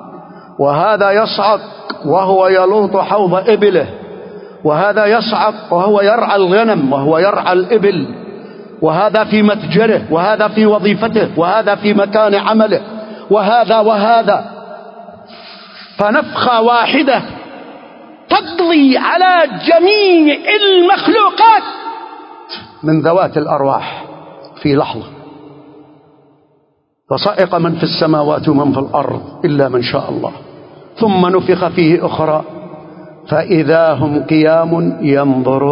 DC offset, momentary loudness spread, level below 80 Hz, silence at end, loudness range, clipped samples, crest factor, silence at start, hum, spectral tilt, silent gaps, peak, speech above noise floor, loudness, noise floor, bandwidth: under 0.1%; 19 LU; -52 dBFS; 0 s; 6 LU; under 0.1%; 12 dB; 0 s; none; -9.5 dB/octave; none; 0 dBFS; 48 dB; -12 LUFS; -59 dBFS; 5.4 kHz